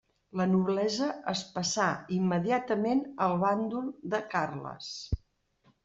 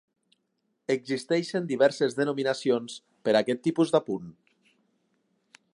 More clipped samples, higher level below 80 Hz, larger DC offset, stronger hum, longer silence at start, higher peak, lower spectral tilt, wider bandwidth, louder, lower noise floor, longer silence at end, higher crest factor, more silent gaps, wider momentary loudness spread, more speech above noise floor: neither; first, -52 dBFS vs -76 dBFS; neither; neither; second, 0.35 s vs 0.9 s; second, -12 dBFS vs -8 dBFS; about the same, -5 dB/octave vs -5.5 dB/octave; second, 7.8 kHz vs 11.5 kHz; second, -31 LUFS vs -27 LUFS; second, -68 dBFS vs -77 dBFS; second, 0.7 s vs 1.45 s; about the same, 18 dB vs 20 dB; neither; about the same, 11 LU vs 11 LU; second, 39 dB vs 51 dB